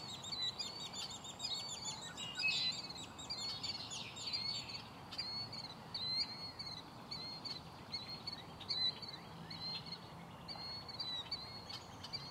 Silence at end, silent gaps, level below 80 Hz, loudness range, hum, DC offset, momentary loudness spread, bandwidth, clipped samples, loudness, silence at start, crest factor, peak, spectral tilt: 0 s; none; -70 dBFS; 3 LU; none; under 0.1%; 12 LU; 16 kHz; under 0.1%; -42 LUFS; 0 s; 18 dB; -26 dBFS; -2 dB/octave